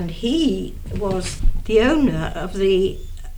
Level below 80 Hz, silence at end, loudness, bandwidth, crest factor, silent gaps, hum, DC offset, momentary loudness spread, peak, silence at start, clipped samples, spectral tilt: -26 dBFS; 0 s; -21 LUFS; 12.5 kHz; 14 dB; none; none; under 0.1%; 10 LU; -4 dBFS; 0 s; under 0.1%; -5.5 dB/octave